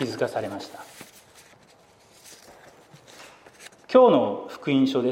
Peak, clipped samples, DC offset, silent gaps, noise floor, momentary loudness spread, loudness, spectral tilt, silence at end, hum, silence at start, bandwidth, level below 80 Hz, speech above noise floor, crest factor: -4 dBFS; under 0.1%; under 0.1%; none; -56 dBFS; 29 LU; -22 LUFS; -6 dB/octave; 0 s; none; 0 s; 15.5 kHz; -72 dBFS; 34 dB; 22 dB